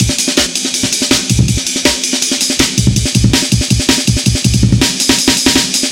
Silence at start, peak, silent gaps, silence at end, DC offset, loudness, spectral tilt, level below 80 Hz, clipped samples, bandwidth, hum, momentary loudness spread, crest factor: 0 s; 0 dBFS; none; 0 s; under 0.1%; -11 LUFS; -3 dB/octave; -24 dBFS; 0.2%; 17 kHz; none; 3 LU; 12 dB